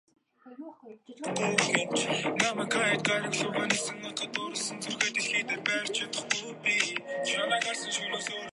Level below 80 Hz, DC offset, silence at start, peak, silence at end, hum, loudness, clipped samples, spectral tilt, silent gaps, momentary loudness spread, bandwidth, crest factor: -78 dBFS; under 0.1%; 0.45 s; -6 dBFS; 0 s; none; -29 LUFS; under 0.1%; -2 dB/octave; none; 8 LU; 11.5 kHz; 24 dB